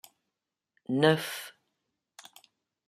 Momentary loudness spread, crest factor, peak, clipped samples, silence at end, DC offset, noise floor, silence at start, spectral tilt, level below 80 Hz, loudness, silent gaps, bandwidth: 26 LU; 24 dB; -10 dBFS; under 0.1%; 1.35 s; under 0.1%; -87 dBFS; 0.9 s; -5 dB/octave; -76 dBFS; -28 LUFS; none; 15.5 kHz